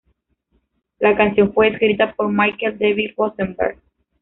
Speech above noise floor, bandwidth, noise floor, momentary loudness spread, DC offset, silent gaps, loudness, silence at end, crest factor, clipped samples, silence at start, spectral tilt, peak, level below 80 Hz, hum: 49 dB; 4 kHz; -66 dBFS; 7 LU; under 0.1%; none; -18 LUFS; 0.5 s; 16 dB; under 0.1%; 1 s; -3.5 dB/octave; -2 dBFS; -50 dBFS; none